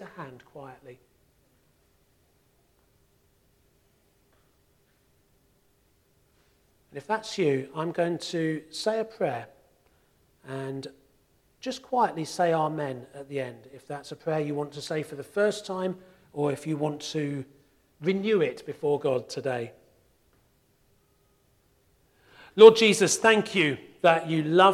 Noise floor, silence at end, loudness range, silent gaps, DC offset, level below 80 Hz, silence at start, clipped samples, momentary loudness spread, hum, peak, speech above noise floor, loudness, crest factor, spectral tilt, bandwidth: -66 dBFS; 0 s; 13 LU; none; under 0.1%; -70 dBFS; 0 s; under 0.1%; 20 LU; none; 0 dBFS; 41 dB; -26 LUFS; 28 dB; -4.5 dB/octave; 13.5 kHz